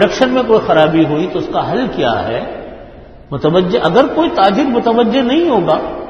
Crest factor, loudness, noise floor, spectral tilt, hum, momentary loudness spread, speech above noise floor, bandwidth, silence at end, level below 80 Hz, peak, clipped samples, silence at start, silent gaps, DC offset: 12 dB; -13 LUFS; -35 dBFS; -6.5 dB/octave; none; 8 LU; 22 dB; 7.4 kHz; 0 s; -40 dBFS; 0 dBFS; under 0.1%; 0 s; none; under 0.1%